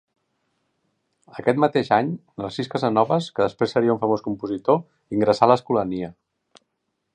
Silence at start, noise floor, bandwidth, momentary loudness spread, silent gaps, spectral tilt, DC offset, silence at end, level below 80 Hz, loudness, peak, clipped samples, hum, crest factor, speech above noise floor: 1.35 s; -76 dBFS; 9.8 kHz; 11 LU; none; -7 dB/octave; under 0.1%; 1.05 s; -60 dBFS; -22 LUFS; 0 dBFS; under 0.1%; none; 22 dB; 55 dB